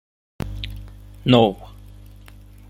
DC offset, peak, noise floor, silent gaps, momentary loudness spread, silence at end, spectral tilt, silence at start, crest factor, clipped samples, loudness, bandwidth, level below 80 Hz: under 0.1%; -2 dBFS; -44 dBFS; none; 25 LU; 1 s; -7.5 dB/octave; 0.4 s; 22 dB; under 0.1%; -19 LUFS; 15.5 kHz; -40 dBFS